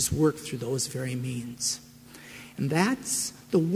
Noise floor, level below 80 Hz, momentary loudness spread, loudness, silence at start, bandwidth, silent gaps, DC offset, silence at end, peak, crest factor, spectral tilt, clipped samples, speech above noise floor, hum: -48 dBFS; -54 dBFS; 18 LU; -29 LUFS; 0 s; 16 kHz; none; under 0.1%; 0 s; -10 dBFS; 20 dB; -4.5 dB/octave; under 0.1%; 20 dB; none